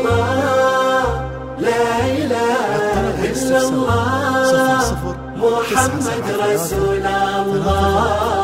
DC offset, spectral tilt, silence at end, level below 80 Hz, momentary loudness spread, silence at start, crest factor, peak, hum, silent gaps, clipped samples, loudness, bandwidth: 0.1%; -5 dB/octave; 0 s; -34 dBFS; 5 LU; 0 s; 16 dB; 0 dBFS; none; none; under 0.1%; -17 LUFS; 16 kHz